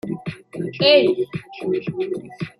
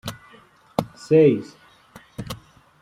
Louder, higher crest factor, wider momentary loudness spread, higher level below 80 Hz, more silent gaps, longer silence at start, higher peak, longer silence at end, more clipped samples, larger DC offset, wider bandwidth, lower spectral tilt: about the same, -20 LUFS vs -20 LUFS; about the same, 20 dB vs 20 dB; second, 16 LU vs 23 LU; about the same, -60 dBFS vs -56 dBFS; neither; about the same, 0.05 s vs 0.05 s; about the same, -2 dBFS vs -4 dBFS; second, 0.1 s vs 0.45 s; neither; neither; second, 11 kHz vs 16 kHz; about the same, -6.5 dB/octave vs -7 dB/octave